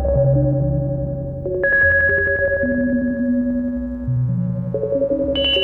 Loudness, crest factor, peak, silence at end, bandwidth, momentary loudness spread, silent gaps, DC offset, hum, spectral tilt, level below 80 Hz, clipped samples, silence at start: -18 LUFS; 12 dB; -6 dBFS; 0 s; 4.1 kHz; 10 LU; none; under 0.1%; none; -9 dB/octave; -32 dBFS; under 0.1%; 0 s